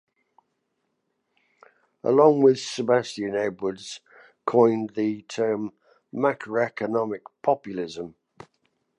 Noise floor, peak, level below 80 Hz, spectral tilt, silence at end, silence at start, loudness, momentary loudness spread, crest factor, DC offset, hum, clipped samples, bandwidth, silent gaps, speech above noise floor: -76 dBFS; -4 dBFS; -72 dBFS; -5.5 dB/octave; 0.9 s; 2.05 s; -24 LUFS; 18 LU; 20 dB; under 0.1%; none; under 0.1%; 10.5 kHz; none; 53 dB